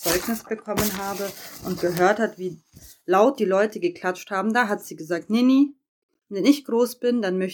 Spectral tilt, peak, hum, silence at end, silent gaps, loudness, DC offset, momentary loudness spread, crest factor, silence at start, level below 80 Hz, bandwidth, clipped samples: -4.5 dB/octave; -4 dBFS; none; 0 s; 5.89-6.09 s; -23 LUFS; under 0.1%; 12 LU; 18 dB; 0 s; -56 dBFS; 19.5 kHz; under 0.1%